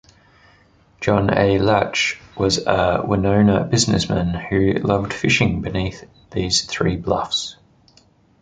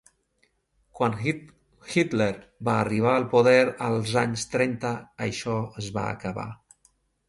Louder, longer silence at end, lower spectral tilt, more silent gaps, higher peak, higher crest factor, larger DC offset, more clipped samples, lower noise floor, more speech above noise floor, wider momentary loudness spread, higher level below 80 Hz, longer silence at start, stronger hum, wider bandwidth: first, -19 LUFS vs -25 LUFS; first, 0.9 s vs 0.75 s; about the same, -5 dB/octave vs -5.5 dB/octave; neither; first, -2 dBFS vs -6 dBFS; about the same, 18 dB vs 20 dB; neither; neither; second, -55 dBFS vs -70 dBFS; second, 36 dB vs 45 dB; second, 8 LU vs 12 LU; first, -38 dBFS vs -58 dBFS; about the same, 1 s vs 0.95 s; neither; second, 9.6 kHz vs 11.5 kHz